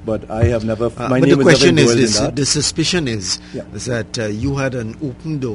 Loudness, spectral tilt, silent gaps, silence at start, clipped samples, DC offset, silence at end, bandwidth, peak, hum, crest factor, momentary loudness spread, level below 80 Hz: -16 LUFS; -4.5 dB/octave; none; 0 s; under 0.1%; under 0.1%; 0 s; 11 kHz; 0 dBFS; none; 16 dB; 14 LU; -38 dBFS